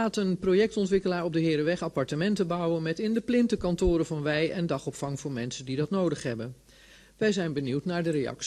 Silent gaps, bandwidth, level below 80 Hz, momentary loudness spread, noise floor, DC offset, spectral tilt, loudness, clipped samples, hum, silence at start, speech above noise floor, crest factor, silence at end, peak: none; 13 kHz; -48 dBFS; 8 LU; -55 dBFS; under 0.1%; -6 dB/octave; -28 LUFS; under 0.1%; none; 0 s; 27 dB; 14 dB; 0 s; -14 dBFS